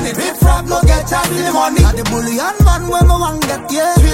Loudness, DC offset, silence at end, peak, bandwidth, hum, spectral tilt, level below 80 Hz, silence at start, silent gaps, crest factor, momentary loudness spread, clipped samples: -13 LUFS; under 0.1%; 0 s; 0 dBFS; 16.5 kHz; none; -5 dB/octave; -16 dBFS; 0 s; none; 12 dB; 5 LU; under 0.1%